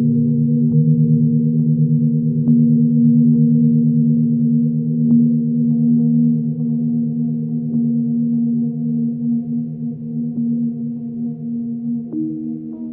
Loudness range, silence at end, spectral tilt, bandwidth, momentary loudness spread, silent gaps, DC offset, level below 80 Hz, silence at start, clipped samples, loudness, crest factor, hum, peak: 8 LU; 0 s; -18 dB/octave; 0.8 kHz; 11 LU; none; under 0.1%; -58 dBFS; 0 s; under 0.1%; -17 LUFS; 12 dB; none; -4 dBFS